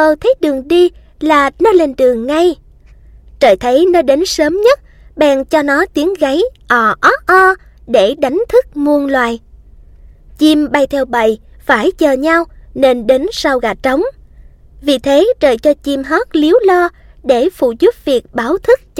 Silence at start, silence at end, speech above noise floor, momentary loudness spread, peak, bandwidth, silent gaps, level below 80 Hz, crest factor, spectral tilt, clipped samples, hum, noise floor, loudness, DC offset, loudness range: 0 s; 0 s; 29 dB; 6 LU; 0 dBFS; 16 kHz; none; -40 dBFS; 12 dB; -4 dB/octave; under 0.1%; none; -40 dBFS; -12 LUFS; under 0.1%; 2 LU